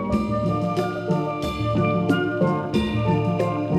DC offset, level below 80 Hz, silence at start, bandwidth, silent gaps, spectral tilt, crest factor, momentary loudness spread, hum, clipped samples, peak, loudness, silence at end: under 0.1%; -42 dBFS; 0 s; 13.5 kHz; none; -8 dB/octave; 16 dB; 3 LU; none; under 0.1%; -6 dBFS; -23 LUFS; 0 s